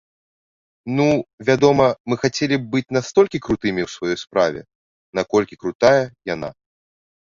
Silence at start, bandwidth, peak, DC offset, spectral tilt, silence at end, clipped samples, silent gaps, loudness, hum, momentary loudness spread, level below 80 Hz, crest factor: 0.85 s; 7.6 kHz; -2 dBFS; under 0.1%; -5.5 dB/octave; 0.8 s; under 0.1%; 1.33-1.38 s, 2.00-2.05 s, 4.75-5.13 s, 5.75-5.79 s; -19 LUFS; none; 12 LU; -52 dBFS; 18 dB